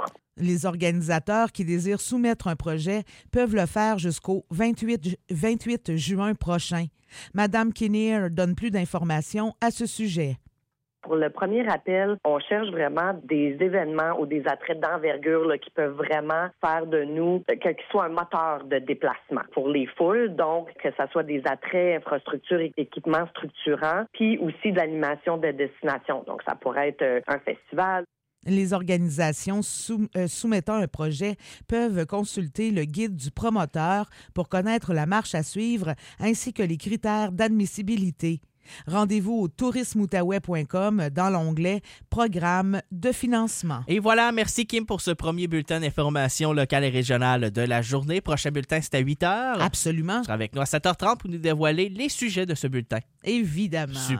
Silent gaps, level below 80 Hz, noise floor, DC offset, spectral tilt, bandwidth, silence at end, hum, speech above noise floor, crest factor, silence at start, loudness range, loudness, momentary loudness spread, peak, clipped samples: none; -50 dBFS; -78 dBFS; under 0.1%; -5.5 dB/octave; 16 kHz; 0 s; none; 53 dB; 18 dB; 0 s; 3 LU; -26 LUFS; 6 LU; -8 dBFS; under 0.1%